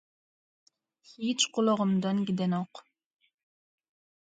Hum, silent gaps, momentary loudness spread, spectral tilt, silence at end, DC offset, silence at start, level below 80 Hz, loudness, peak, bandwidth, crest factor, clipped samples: none; none; 9 LU; -4.5 dB/octave; 1.5 s; under 0.1%; 1.2 s; -76 dBFS; -29 LUFS; -12 dBFS; 9.4 kHz; 20 dB; under 0.1%